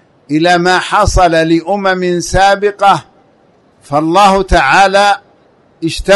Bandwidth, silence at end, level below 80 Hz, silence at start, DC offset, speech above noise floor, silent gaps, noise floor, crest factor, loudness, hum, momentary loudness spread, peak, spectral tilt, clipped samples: 12 kHz; 0 s; -26 dBFS; 0.3 s; under 0.1%; 39 dB; none; -49 dBFS; 10 dB; -10 LUFS; none; 10 LU; 0 dBFS; -4.5 dB/octave; under 0.1%